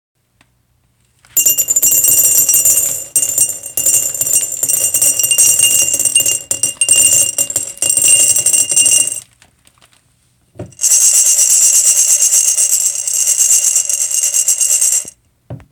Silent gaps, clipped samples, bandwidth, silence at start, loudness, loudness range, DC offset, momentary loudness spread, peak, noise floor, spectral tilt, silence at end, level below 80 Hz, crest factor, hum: none; under 0.1%; over 20 kHz; 1.35 s; -9 LUFS; 3 LU; under 0.1%; 7 LU; 0 dBFS; -58 dBFS; 1.5 dB/octave; 0.15 s; -56 dBFS; 14 dB; none